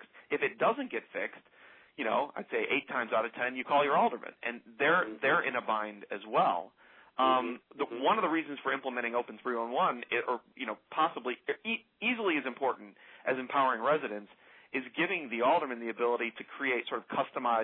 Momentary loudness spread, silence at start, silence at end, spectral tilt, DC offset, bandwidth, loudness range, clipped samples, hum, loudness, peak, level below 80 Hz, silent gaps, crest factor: 11 LU; 0 s; 0 s; -8 dB/octave; under 0.1%; 4.2 kHz; 3 LU; under 0.1%; none; -32 LUFS; -16 dBFS; -88 dBFS; none; 18 dB